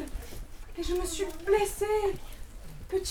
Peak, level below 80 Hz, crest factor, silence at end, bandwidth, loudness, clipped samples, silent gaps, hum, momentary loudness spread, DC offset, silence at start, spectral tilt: -14 dBFS; -42 dBFS; 18 dB; 0 s; 19 kHz; -31 LUFS; under 0.1%; none; none; 21 LU; under 0.1%; 0 s; -4 dB/octave